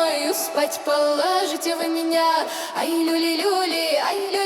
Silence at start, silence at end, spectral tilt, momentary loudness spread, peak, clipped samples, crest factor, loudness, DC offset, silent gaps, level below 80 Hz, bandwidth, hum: 0 s; 0 s; -1 dB/octave; 4 LU; -8 dBFS; under 0.1%; 14 dB; -21 LUFS; under 0.1%; none; -76 dBFS; 18.5 kHz; none